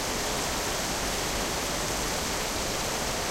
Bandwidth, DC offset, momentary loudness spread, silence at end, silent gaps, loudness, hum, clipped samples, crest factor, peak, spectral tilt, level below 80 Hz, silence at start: 16 kHz; under 0.1%; 1 LU; 0 s; none; -28 LUFS; none; under 0.1%; 14 dB; -16 dBFS; -2 dB/octave; -40 dBFS; 0 s